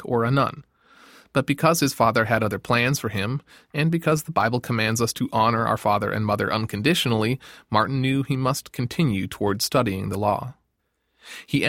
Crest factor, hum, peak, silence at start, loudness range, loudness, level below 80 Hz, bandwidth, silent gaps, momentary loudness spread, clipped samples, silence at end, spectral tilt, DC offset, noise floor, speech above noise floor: 20 dB; none; -4 dBFS; 0 s; 2 LU; -23 LUFS; -54 dBFS; 17 kHz; none; 7 LU; under 0.1%; 0 s; -5 dB/octave; under 0.1%; -73 dBFS; 51 dB